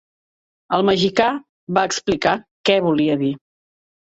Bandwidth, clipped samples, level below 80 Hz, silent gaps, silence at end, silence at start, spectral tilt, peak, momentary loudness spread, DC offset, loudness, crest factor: 8 kHz; under 0.1%; -54 dBFS; 1.49-1.67 s, 2.51-2.64 s; 0.65 s; 0.7 s; -4.5 dB/octave; -2 dBFS; 7 LU; under 0.1%; -19 LUFS; 18 dB